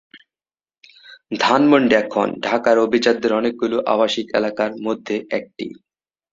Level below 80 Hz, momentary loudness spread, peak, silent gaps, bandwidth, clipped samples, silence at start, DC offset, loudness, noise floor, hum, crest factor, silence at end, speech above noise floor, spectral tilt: -62 dBFS; 12 LU; 0 dBFS; none; 7.8 kHz; under 0.1%; 0.15 s; under 0.1%; -18 LUFS; under -90 dBFS; none; 20 dB; 0.6 s; over 72 dB; -5 dB/octave